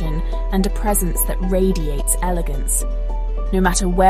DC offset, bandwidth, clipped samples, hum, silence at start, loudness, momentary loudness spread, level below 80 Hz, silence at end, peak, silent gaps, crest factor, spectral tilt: under 0.1%; 15.5 kHz; under 0.1%; none; 0 s; -20 LUFS; 8 LU; -20 dBFS; 0 s; -2 dBFS; none; 14 dB; -4.5 dB/octave